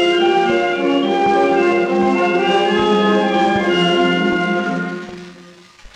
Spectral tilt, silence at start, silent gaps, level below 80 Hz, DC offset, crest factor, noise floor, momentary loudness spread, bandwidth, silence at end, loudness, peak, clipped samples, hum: -5.5 dB/octave; 0 s; none; -52 dBFS; under 0.1%; 12 dB; -42 dBFS; 7 LU; 9.2 kHz; 0.05 s; -15 LUFS; -4 dBFS; under 0.1%; none